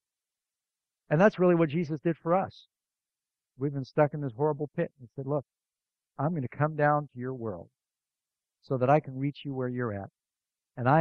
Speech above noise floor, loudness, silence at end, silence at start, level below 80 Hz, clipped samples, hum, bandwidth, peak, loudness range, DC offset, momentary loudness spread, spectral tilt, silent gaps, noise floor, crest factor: over 62 dB; -29 LUFS; 0 s; 1.1 s; -70 dBFS; under 0.1%; none; 6.6 kHz; -8 dBFS; 4 LU; under 0.1%; 13 LU; -9.5 dB/octave; none; under -90 dBFS; 22 dB